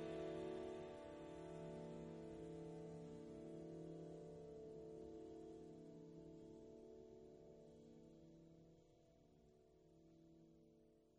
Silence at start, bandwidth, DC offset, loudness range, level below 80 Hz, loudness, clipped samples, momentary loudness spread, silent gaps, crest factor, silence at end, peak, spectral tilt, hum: 0 s; 10 kHz; under 0.1%; 13 LU; -76 dBFS; -56 LUFS; under 0.1%; 14 LU; none; 18 dB; 0 s; -38 dBFS; -7 dB/octave; none